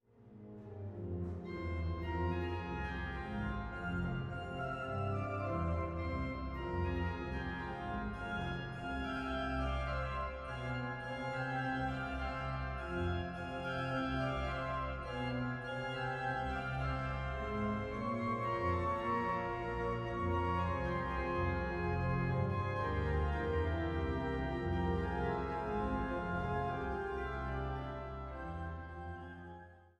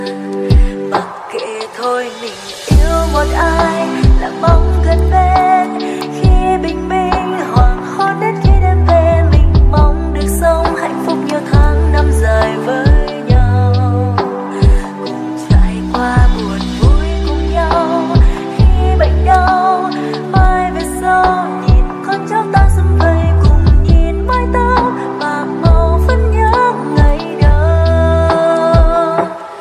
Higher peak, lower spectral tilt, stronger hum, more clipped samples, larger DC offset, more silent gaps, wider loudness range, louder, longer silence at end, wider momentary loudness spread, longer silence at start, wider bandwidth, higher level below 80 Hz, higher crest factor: second, -24 dBFS vs 0 dBFS; about the same, -8 dB/octave vs -7 dB/octave; neither; neither; neither; neither; about the same, 4 LU vs 2 LU; second, -39 LUFS vs -12 LUFS; about the same, 0.1 s vs 0 s; about the same, 7 LU vs 7 LU; first, 0.2 s vs 0 s; second, 9 kHz vs 13 kHz; second, -46 dBFS vs -14 dBFS; about the same, 14 dB vs 10 dB